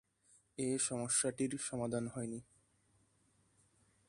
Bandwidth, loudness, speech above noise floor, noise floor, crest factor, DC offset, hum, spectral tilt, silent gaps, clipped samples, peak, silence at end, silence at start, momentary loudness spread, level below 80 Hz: 11.5 kHz; -37 LUFS; 36 dB; -74 dBFS; 20 dB; under 0.1%; none; -4 dB/octave; none; under 0.1%; -22 dBFS; 1.65 s; 0.6 s; 12 LU; -72 dBFS